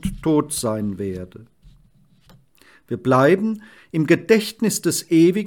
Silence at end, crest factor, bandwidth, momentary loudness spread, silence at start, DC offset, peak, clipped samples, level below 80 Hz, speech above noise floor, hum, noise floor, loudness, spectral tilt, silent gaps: 0 s; 18 dB; 18 kHz; 14 LU; 0.05 s; under 0.1%; -4 dBFS; under 0.1%; -46 dBFS; 37 dB; none; -56 dBFS; -19 LUFS; -5.5 dB/octave; none